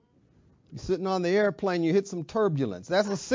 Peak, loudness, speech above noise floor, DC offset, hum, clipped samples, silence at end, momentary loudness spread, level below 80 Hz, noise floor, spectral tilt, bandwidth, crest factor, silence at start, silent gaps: -12 dBFS; -27 LUFS; 35 dB; under 0.1%; none; under 0.1%; 0 s; 7 LU; -58 dBFS; -62 dBFS; -6 dB/octave; 7.6 kHz; 16 dB; 0.7 s; none